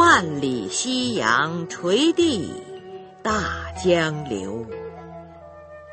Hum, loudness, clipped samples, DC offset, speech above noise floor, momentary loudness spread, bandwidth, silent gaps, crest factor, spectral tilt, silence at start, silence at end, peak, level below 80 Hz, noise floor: none; -22 LUFS; under 0.1%; under 0.1%; 20 dB; 22 LU; 8.8 kHz; none; 20 dB; -4 dB/octave; 0 s; 0 s; -2 dBFS; -48 dBFS; -42 dBFS